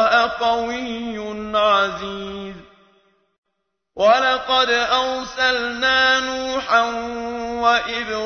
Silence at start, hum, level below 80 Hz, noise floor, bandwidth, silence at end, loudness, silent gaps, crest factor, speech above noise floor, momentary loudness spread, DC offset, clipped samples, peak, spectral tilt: 0 s; none; -50 dBFS; -76 dBFS; 6.6 kHz; 0 s; -19 LUFS; 3.38-3.43 s; 18 dB; 57 dB; 13 LU; under 0.1%; under 0.1%; -2 dBFS; -2.5 dB/octave